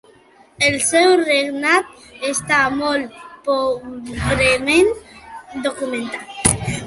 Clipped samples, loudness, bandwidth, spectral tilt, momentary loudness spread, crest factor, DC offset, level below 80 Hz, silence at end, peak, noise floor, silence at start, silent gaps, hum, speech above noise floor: under 0.1%; -17 LUFS; 13 kHz; -3 dB/octave; 16 LU; 18 dB; under 0.1%; -40 dBFS; 0 s; 0 dBFS; -50 dBFS; 0.6 s; none; none; 32 dB